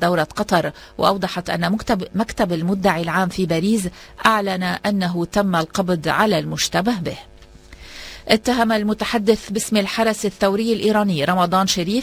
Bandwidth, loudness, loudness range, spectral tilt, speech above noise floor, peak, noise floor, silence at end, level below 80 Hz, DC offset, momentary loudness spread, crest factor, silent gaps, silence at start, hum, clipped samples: 16 kHz; -19 LUFS; 2 LU; -4.5 dB/octave; 24 dB; 0 dBFS; -43 dBFS; 0 s; -46 dBFS; under 0.1%; 6 LU; 20 dB; none; 0 s; none; under 0.1%